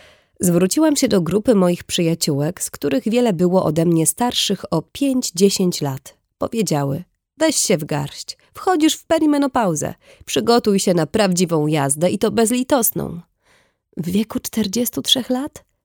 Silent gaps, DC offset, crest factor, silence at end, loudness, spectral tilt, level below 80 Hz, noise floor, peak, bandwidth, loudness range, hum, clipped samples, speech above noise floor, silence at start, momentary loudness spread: none; under 0.1%; 18 dB; 0.25 s; -18 LUFS; -4.5 dB/octave; -52 dBFS; -59 dBFS; -2 dBFS; over 20 kHz; 3 LU; none; under 0.1%; 41 dB; 0.4 s; 10 LU